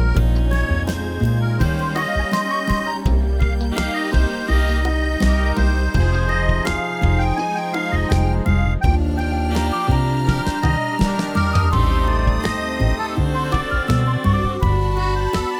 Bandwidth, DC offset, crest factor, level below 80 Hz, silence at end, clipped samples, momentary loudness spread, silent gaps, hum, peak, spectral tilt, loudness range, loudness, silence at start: 15.5 kHz; under 0.1%; 14 dB; -22 dBFS; 0 s; under 0.1%; 3 LU; none; none; -4 dBFS; -6.5 dB/octave; 1 LU; -19 LUFS; 0 s